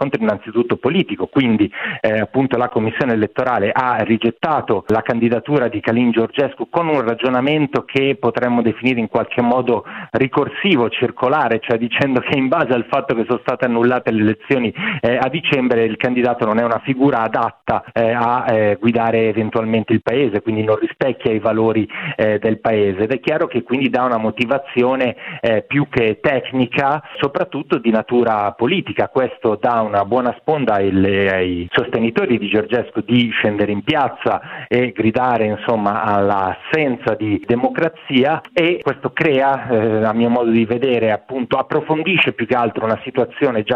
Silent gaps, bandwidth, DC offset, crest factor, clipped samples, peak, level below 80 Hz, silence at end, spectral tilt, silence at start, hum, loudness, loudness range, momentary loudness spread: none; 6.2 kHz; under 0.1%; 16 dB; under 0.1%; -2 dBFS; -54 dBFS; 0 s; -8 dB/octave; 0 s; none; -17 LUFS; 1 LU; 4 LU